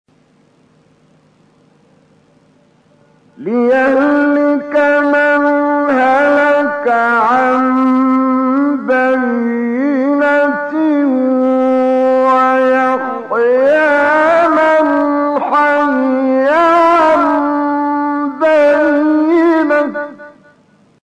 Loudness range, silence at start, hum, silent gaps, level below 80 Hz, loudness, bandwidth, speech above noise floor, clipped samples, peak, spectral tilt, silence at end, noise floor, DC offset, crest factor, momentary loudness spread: 3 LU; 3.4 s; none; none; -58 dBFS; -12 LUFS; 9.4 kHz; 40 dB; under 0.1%; -4 dBFS; -5.5 dB/octave; 0.75 s; -52 dBFS; under 0.1%; 8 dB; 5 LU